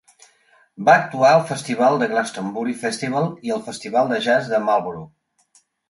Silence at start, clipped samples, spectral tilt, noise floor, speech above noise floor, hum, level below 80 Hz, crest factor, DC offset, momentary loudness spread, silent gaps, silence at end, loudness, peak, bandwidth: 0.8 s; under 0.1%; -5 dB/octave; -60 dBFS; 41 dB; none; -66 dBFS; 18 dB; under 0.1%; 11 LU; none; 0.8 s; -19 LUFS; -2 dBFS; 11.5 kHz